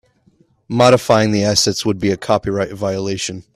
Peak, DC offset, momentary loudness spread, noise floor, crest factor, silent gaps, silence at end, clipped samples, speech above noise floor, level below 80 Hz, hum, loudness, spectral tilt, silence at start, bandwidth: 0 dBFS; under 0.1%; 9 LU; -56 dBFS; 16 dB; none; 0.15 s; under 0.1%; 40 dB; -48 dBFS; none; -16 LUFS; -4.5 dB/octave; 0.7 s; 14.5 kHz